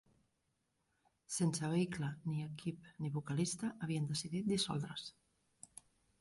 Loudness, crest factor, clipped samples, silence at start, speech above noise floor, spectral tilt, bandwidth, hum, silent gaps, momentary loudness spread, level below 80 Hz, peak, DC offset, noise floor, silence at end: -40 LUFS; 18 dB; under 0.1%; 1.3 s; 44 dB; -5 dB/octave; 11.5 kHz; none; none; 18 LU; -72 dBFS; -24 dBFS; under 0.1%; -83 dBFS; 1.1 s